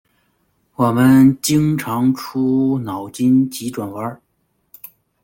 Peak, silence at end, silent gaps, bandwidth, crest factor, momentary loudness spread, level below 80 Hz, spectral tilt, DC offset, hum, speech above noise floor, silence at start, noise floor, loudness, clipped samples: -2 dBFS; 1.1 s; none; 17 kHz; 16 dB; 15 LU; -52 dBFS; -6 dB/octave; under 0.1%; none; 51 dB; 0.8 s; -66 dBFS; -16 LUFS; under 0.1%